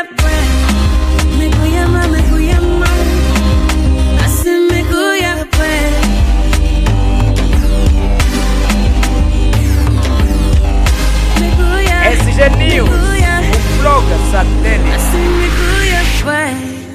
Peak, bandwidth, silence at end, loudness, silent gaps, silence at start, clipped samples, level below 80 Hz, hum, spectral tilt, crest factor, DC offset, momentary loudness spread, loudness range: 0 dBFS; 15.5 kHz; 0 s; -12 LUFS; none; 0 s; under 0.1%; -12 dBFS; none; -5.5 dB/octave; 10 dB; under 0.1%; 3 LU; 2 LU